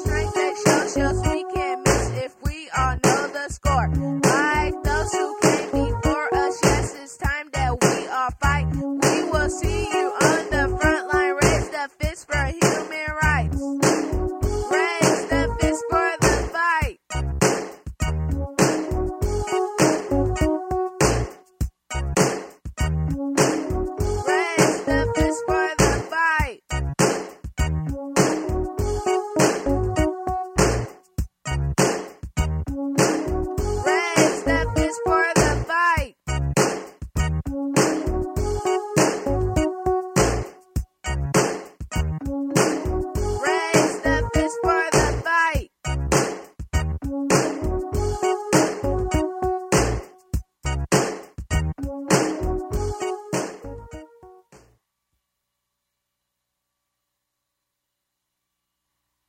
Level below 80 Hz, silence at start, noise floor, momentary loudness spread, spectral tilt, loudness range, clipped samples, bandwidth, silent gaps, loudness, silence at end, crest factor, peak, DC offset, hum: -32 dBFS; 0 s; -80 dBFS; 9 LU; -4.5 dB/octave; 3 LU; under 0.1%; 16.5 kHz; none; -22 LUFS; 4.7 s; 20 dB; -2 dBFS; under 0.1%; 60 Hz at -55 dBFS